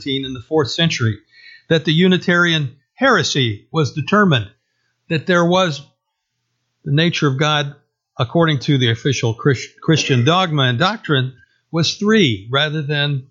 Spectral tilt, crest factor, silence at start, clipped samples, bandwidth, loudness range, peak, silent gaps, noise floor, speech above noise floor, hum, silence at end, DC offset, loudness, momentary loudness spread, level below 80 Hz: -5 dB/octave; 16 dB; 0 s; under 0.1%; 7.6 kHz; 3 LU; -2 dBFS; none; -74 dBFS; 58 dB; none; 0.05 s; under 0.1%; -17 LUFS; 9 LU; -58 dBFS